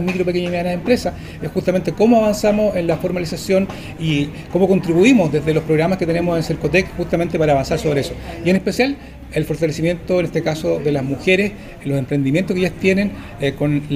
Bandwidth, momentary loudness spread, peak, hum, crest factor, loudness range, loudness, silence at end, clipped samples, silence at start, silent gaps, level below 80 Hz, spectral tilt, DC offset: 15.5 kHz; 9 LU; 0 dBFS; none; 16 dB; 3 LU; -18 LUFS; 0 s; under 0.1%; 0 s; none; -38 dBFS; -6.5 dB/octave; under 0.1%